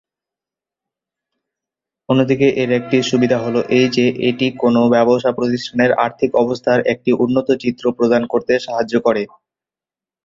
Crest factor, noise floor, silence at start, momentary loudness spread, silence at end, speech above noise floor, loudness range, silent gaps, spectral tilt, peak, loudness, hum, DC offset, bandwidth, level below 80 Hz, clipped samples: 16 dB; -90 dBFS; 2.1 s; 5 LU; 1 s; 75 dB; 3 LU; none; -6 dB/octave; -2 dBFS; -16 LUFS; none; under 0.1%; 7.6 kHz; -56 dBFS; under 0.1%